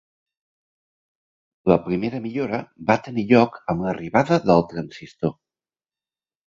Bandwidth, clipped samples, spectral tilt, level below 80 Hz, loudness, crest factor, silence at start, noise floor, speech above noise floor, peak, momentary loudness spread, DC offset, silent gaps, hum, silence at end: 7.4 kHz; under 0.1%; -7.5 dB/octave; -54 dBFS; -21 LUFS; 22 dB; 1.65 s; under -90 dBFS; over 69 dB; -2 dBFS; 11 LU; under 0.1%; none; none; 1.15 s